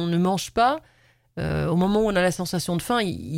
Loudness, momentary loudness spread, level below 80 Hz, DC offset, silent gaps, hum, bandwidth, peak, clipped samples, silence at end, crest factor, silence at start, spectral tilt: -23 LUFS; 8 LU; -46 dBFS; under 0.1%; none; none; 16 kHz; -8 dBFS; under 0.1%; 0 s; 16 dB; 0 s; -5.5 dB/octave